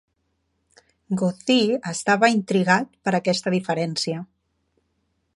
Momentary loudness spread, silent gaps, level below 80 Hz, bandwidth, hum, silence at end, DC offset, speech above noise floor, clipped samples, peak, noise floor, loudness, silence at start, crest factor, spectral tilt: 7 LU; none; -68 dBFS; 11.5 kHz; none; 1.1 s; under 0.1%; 51 dB; under 0.1%; -4 dBFS; -72 dBFS; -22 LUFS; 1.1 s; 20 dB; -5 dB/octave